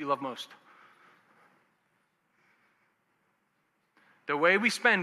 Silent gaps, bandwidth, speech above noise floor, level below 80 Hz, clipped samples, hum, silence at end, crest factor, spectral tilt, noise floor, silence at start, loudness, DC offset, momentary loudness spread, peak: none; 14.5 kHz; 48 dB; under -90 dBFS; under 0.1%; none; 0 s; 24 dB; -3.5 dB/octave; -75 dBFS; 0 s; -27 LUFS; under 0.1%; 20 LU; -10 dBFS